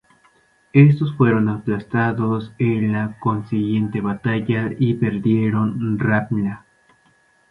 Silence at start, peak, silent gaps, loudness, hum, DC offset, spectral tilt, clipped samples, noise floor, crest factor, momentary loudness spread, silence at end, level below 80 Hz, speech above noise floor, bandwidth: 0.75 s; 0 dBFS; none; -19 LUFS; none; under 0.1%; -10 dB/octave; under 0.1%; -58 dBFS; 18 dB; 8 LU; 0.95 s; -52 dBFS; 40 dB; 4.4 kHz